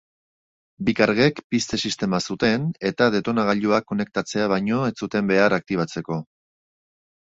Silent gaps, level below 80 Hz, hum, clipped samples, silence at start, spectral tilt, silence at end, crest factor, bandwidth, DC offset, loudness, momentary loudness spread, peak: 1.44-1.50 s; -56 dBFS; none; under 0.1%; 0.8 s; -5.5 dB/octave; 1.15 s; 20 dB; 8 kHz; under 0.1%; -22 LUFS; 7 LU; -2 dBFS